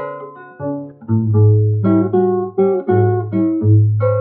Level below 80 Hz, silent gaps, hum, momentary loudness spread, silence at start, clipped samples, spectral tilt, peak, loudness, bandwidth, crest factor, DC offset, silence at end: -62 dBFS; none; none; 15 LU; 0 s; under 0.1%; -12 dB/octave; -2 dBFS; -15 LUFS; 2.3 kHz; 12 dB; under 0.1%; 0 s